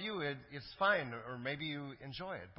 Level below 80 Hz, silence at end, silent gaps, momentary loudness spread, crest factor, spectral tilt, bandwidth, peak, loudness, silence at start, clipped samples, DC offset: -68 dBFS; 0.05 s; none; 13 LU; 20 dB; -2.5 dB/octave; 5.6 kHz; -20 dBFS; -39 LUFS; 0 s; under 0.1%; under 0.1%